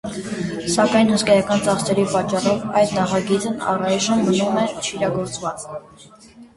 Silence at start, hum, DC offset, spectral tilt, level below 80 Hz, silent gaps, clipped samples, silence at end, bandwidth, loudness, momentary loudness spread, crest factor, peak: 0.05 s; none; under 0.1%; -4.5 dB/octave; -52 dBFS; none; under 0.1%; 0.1 s; 11.5 kHz; -19 LUFS; 11 LU; 18 dB; -2 dBFS